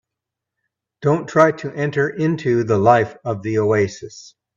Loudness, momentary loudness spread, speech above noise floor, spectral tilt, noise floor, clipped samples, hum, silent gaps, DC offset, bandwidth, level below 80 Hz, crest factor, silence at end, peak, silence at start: -18 LUFS; 9 LU; 66 dB; -7 dB/octave; -84 dBFS; under 0.1%; none; none; under 0.1%; 7.6 kHz; -58 dBFS; 18 dB; 0.3 s; 0 dBFS; 1 s